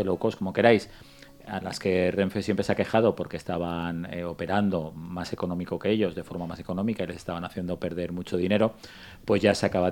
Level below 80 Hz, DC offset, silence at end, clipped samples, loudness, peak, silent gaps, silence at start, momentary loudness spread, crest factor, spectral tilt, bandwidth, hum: -56 dBFS; under 0.1%; 0 s; under 0.1%; -27 LUFS; -4 dBFS; none; 0 s; 12 LU; 24 dB; -6.5 dB/octave; 19 kHz; none